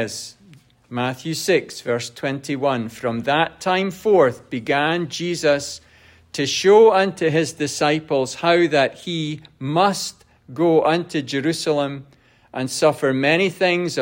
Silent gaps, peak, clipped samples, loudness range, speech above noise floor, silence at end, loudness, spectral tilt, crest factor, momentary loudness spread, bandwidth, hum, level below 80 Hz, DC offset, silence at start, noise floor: none; -2 dBFS; under 0.1%; 4 LU; 30 dB; 0 s; -20 LUFS; -4.5 dB/octave; 18 dB; 13 LU; 16.5 kHz; none; -62 dBFS; under 0.1%; 0 s; -50 dBFS